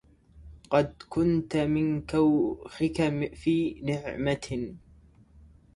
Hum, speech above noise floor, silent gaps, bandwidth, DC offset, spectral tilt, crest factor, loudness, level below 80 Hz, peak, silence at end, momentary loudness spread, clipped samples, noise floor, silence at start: none; 29 dB; none; 11.5 kHz; under 0.1%; -7 dB/octave; 20 dB; -28 LUFS; -52 dBFS; -10 dBFS; 1 s; 8 LU; under 0.1%; -56 dBFS; 0.35 s